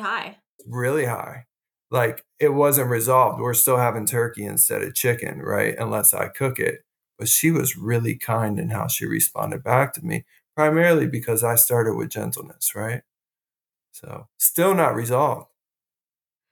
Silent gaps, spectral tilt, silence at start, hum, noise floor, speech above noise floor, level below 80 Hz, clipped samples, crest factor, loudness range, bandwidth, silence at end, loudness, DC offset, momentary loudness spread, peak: 0.49-0.59 s; -4.5 dB/octave; 0 s; none; under -90 dBFS; over 68 dB; -66 dBFS; under 0.1%; 20 dB; 4 LU; 19.5 kHz; 1.1 s; -21 LUFS; under 0.1%; 13 LU; -2 dBFS